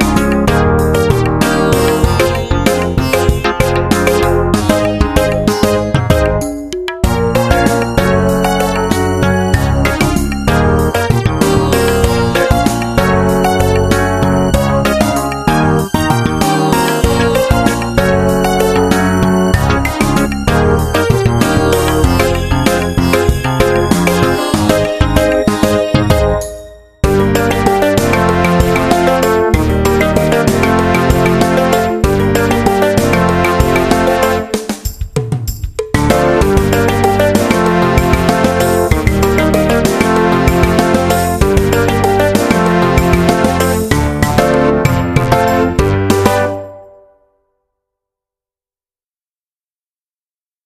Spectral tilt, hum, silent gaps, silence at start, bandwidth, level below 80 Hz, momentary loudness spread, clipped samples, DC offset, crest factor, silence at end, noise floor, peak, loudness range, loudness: -5.5 dB/octave; none; none; 0 s; 14.5 kHz; -22 dBFS; 3 LU; under 0.1%; under 0.1%; 12 dB; 3.8 s; under -90 dBFS; 0 dBFS; 2 LU; -12 LUFS